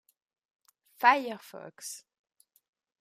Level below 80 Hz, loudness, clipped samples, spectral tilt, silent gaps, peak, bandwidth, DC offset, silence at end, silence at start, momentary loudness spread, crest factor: under -90 dBFS; -26 LUFS; under 0.1%; -2 dB/octave; none; -8 dBFS; 15.5 kHz; under 0.1%; 1.05 s; 1 s; 21 LU; 26 dB